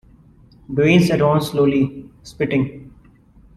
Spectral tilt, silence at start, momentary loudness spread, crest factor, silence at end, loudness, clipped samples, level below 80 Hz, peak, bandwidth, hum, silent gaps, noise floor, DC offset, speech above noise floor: -7 dB/octave; 0.7 s; 12 LU; 18 dB; 0.65 s; -18 LUFS; under 0.1%; -48 dBFS; -2 dBFS; 14 kHz; none; none; -49 dBFS; under 0.1%; 32 dB